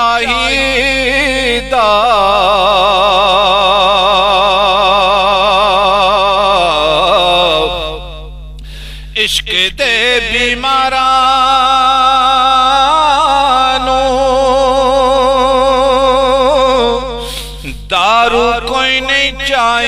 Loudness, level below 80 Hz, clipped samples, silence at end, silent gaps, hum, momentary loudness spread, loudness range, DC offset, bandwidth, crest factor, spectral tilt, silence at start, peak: -9 LUFS; -30 dBFS; under 0.1%; 0 s; none; none; 6 LU; 4 LU; under 0.1%; 15.5 kHz; 10 dB; -2.5 dB/octave; 0 s; 0 dBFS